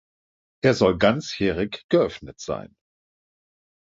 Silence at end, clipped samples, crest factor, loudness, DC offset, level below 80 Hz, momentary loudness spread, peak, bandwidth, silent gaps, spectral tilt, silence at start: 1.35 s; under 0.1%; 20 dB; -22 LUFS; under 0.1%; -50 dBFS; 13 LU; -4 dBFS; 7.8 kHz; 1.84-1.89 s; -5.5 dB/octave; 0.65 s